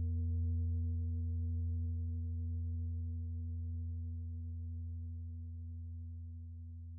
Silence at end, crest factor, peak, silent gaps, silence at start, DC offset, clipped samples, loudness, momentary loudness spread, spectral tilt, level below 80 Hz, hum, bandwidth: 0 s; 8 dB; -30 dBFS; none; 0 s; under 0.1%; under 0.1%; -41 LUFS; 10 LU; -18 dB/octave; -50 dBFS; none; 0.5 kHz